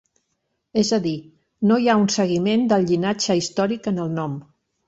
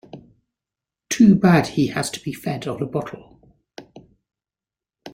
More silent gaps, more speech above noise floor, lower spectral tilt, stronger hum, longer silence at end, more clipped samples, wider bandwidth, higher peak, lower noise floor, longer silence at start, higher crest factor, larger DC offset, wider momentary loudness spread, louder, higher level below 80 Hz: neither; second, 54 dB vs over 71 dB; about the same, -5 dB/octave vs -6 dB/octave; neither; first, 0.45 s vs 0.05 s; neither; second, 8 kHz vs 16 kHz; about the same, -6 dBFS vs -4 dBFS; second, -74 dBFS vs under -90 dBFS; first, 0.75 s vs 0.15 s; about the same, 14 dB vs 18 dB; neither; second, 10 LU vs 15 LU; about the same, -21 LUFS vs -19 LUFS; about the same, -60 dBFS vs -56 dBFS